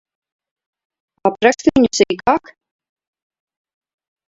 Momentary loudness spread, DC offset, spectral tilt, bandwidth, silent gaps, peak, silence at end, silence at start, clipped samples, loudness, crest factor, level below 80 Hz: 7 LU; under 0.1%; -4 dB/octave; 8 kHz; none; 0 dBFS; 1.9 s; 1.25 s; under 0.1%; -16 LUFS; 20 dB; -50 dBFS